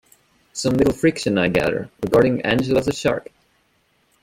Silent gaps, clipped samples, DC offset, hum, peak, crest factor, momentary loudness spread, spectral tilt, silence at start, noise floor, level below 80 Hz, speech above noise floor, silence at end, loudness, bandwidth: none; under 0.1%; under 0.1%; none; -2 dBFS; 18 dB; 8 LU; -5.5 dB/octave; 0.55 s; -63 dBFS; -46 dBFS; 44 dB; 1 s; -20 LUFS; 17 kHz